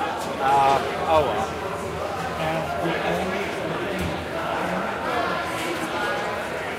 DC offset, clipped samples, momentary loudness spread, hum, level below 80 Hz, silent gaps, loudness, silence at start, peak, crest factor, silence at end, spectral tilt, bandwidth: under 0.1%; under 0.1%; 7 LU; none; -48 dBFS; none; -24 LUFS; 0 s; -6 dBFS; 18 dB; 0 s; -4.5 dB/octave; 16 kHz